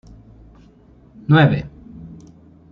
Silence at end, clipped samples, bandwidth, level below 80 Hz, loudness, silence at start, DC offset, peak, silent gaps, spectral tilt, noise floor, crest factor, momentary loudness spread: 0.6 s; under 0.1%; 5.2 kHz; -46 dBFS; -16 LUFS; 1.3 s; under 0.1%; -2 dBFS; none; -9 dB/octave; -49 dBFS; 18 dB; 26 LU